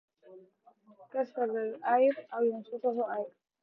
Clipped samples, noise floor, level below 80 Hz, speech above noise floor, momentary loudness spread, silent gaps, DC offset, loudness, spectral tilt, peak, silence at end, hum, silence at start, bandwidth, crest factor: under 0.1%; -62 dBFS; under -90 dBFS; 32 dB; 11 LU; none; under 0.1%; -32 LUFS; -8 dB/octave; -16 dBFS; 0.35 s; none; 0.3 s; 5.6 kHz; 18 dB